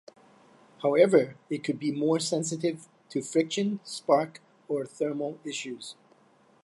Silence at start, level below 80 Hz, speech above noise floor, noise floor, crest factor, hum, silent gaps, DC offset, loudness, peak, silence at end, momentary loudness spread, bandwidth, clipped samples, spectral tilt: 0.8 s; -82 dBFS; 34 dB; -61 dBFS; 22 dB; none; none; under 0.1%; -28 LUFS; -8 dBFS; 0.7 s; 13 LU; 11.5 kHz; under 0.1%; -5 dB/octave